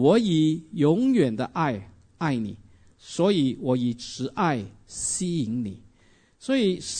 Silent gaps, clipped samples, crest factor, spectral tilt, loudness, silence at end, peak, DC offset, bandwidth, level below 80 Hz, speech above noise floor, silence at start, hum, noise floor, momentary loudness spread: none; under 0.1%; 18 dB; -5.5 dB/octave; -25 LUFS; 0 s; -8 dBFS; under 0.1%; 9.6 kHz; -58 dBFS; 35 dB; 0 s; none; -59 dBFS; 12 LU